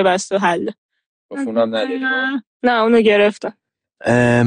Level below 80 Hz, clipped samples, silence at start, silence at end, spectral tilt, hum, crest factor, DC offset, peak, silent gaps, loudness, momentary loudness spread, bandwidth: -52 dBFS; under 0.1%; 0 s; 0 s; -5.5 dB/octave; none; 14 dB; under 0.1%; -4 dBFS; 0.78-0.89 s, 1.06-1.29 s, 2.47-2.60 s; -17 LUFS; 14 LU; 10 kHz